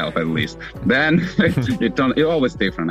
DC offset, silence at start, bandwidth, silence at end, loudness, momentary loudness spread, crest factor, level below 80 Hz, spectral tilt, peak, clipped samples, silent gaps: under 0.1%; 0 s; 14 kHz; 0 s; -19 LUFS; 6 LU; 12 dB; -42 dBFS; -6.5 dB/octave; -6 dBFS; under 0.1%; none